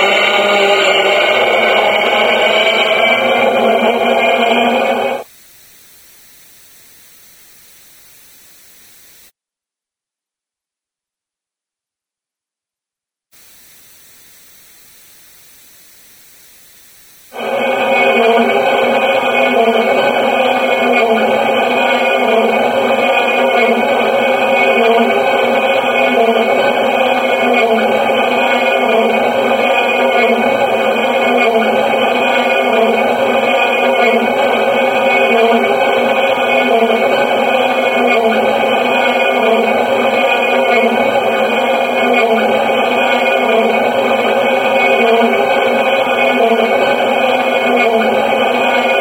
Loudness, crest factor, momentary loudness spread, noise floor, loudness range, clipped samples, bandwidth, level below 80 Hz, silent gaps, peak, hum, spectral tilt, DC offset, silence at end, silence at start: -11 LUFS; 12 dB; 2 LU; -87 dBFS; 3 LU; under 0.1%; over 20 kHz; -62 dBFS; none; 0 dBFS; none; -3.5 dB/octave; under 0.1%; 0 s; 0 s